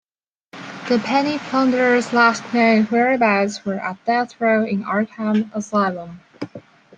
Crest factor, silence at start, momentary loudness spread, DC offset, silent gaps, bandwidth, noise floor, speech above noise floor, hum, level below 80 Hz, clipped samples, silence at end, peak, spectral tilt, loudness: 18 dB; 0.55 s; 18 LU; under 0.1%; none; 9.2 kHz; -82 dBFS; 64 dB; none; -66 dBFS; under 0.1%; 0.4 s; -2 dBFS; -5.5 dB/octave; -18 LUFS